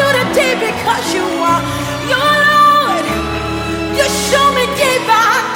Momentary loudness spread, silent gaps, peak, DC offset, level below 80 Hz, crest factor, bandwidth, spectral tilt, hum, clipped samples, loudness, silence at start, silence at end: 9 LU; none; 0 dBFS; under 0.1%; -36 dBFS; 12 dB; 17 kHz; -3.5 dB/octave; none; under 0.1%; -12 LUFS; 0 s; 0 s